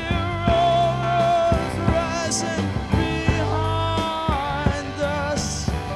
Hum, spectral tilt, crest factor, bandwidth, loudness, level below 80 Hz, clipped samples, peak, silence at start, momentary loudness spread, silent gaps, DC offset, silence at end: none; -5 dB/octave; 16 dB; 13 kHz; -22 LUFS; -32 dBFS; under 0.1%; -6 dBFS; 0 s; 6 LU; none; under 0.1%; 0 s